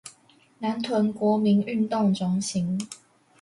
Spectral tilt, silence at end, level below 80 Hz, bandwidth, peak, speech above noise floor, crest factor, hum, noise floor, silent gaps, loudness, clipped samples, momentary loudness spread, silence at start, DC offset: -6 dB/octave; 0.45 s; -66 dBFS; 11.5 kHz; -12 dBFS; 34 dB; 14 dB; none; -58 dBFS; none; -25 LUFS; under 0.1%; 12 LU; 0.05 s; under 0.1%